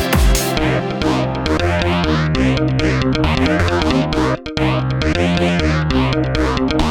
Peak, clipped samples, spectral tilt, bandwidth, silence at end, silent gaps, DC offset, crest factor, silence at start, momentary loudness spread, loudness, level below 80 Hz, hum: -2 dBFS; under 0.1%; -5.5 dB/octave; 19.5 kHz; 0 s; none; under 0.1%; 14 dB; 0 s; 3 LU; -16 LUFS; -24 dBFS; none